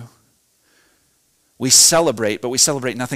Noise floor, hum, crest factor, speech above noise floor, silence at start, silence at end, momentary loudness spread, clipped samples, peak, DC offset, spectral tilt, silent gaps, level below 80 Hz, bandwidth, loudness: -62 dBFS; none; 16 dB; 46 dB; 0 s; 0 s; 13 LU; under 0.1%; -2 dBFS; under 0.1%; -1.5 dB/octave; none; -56 dBFS; 16.5 kHz; -14 LUFS